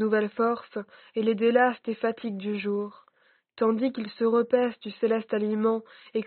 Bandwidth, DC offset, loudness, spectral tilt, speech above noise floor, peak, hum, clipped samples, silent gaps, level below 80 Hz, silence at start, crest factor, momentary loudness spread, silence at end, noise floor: 4.5 kHz; under 0.1%; -27 LUFS; -4.5 dB/octave; 39 dB; -10 dBFS; none; under 0.1%; none; -78 dBFS; 0 s; 18 dB; 10 LU; 0 s; -65 dBFS